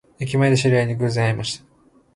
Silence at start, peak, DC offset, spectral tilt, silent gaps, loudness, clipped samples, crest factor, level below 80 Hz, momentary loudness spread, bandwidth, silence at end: 0.2 s; -4 dBFS; under 0.1%; -6 dB/octave; none; -20 LUFS; under 0.1%; 16 dB; -52 dBFS; 10 LU; 11.5 kHz; 0.6 s